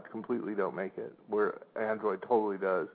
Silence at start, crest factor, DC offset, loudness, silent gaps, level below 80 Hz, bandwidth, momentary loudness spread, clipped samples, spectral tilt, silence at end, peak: 0 s; 18 dB; under 0.1%; -33 LUFS; none; -86 dBFS; 4.6 kHz; 8 LU; under 0.1%; -6 dB/octave; 0 s; -16 dBFS